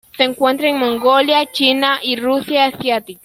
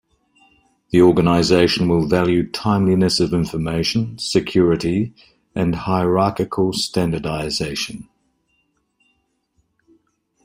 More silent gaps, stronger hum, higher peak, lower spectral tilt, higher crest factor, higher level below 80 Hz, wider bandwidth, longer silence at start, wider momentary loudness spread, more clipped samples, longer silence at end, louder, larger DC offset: neither; neither; about the same, -2 dBFS vs -2 dBFS; second, -3 dB/octave vs -6 dB/octave; about the same, 14 dB vs 18 dB; second, -58 dBFS vs -46 dBFS; about the same, 16.5 kHz vs 16 kHz; second, 0.15 s vs 0.95 s; second, 5 LU vs 9 LU; neither; second, 0.1 s vs 2.45 s; first, -15 LUFS vs -18 LUFS; neither